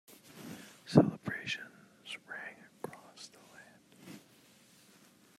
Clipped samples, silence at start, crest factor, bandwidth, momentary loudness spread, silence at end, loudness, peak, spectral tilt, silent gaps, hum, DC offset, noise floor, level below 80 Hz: under 0.1%; 0.35 s; 28 dB; 15 kHz; 27 LU; 1.2 s; -34 LUFS; -10 dBFS; -6.5 dB/octave; none; none; under 0.1%; -63 dBFS; -78 dBFS